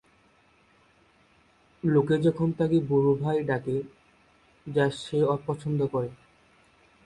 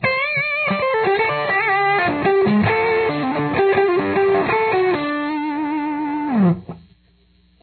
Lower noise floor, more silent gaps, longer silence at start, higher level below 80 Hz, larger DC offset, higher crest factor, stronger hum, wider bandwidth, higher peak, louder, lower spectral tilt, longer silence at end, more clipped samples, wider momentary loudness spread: first, -62 dBFS vs -56 dBFS; neither; first, 1.85 s vs 0 s; second, -60 dBFS vs -52 dBFS; neither; about the same, 18 dB vs 14 dB; neither; first, 11 kHz vs 4.5 kHz; second, -10 dBFS vs -4 dBFS; second, -26 LUFS vs -18 LUFS; second, -8 dB/octave vs -10 dB/octave; about the same, 0.9 s vs 0.85 s; neither; first, 9 LU vs 6 LU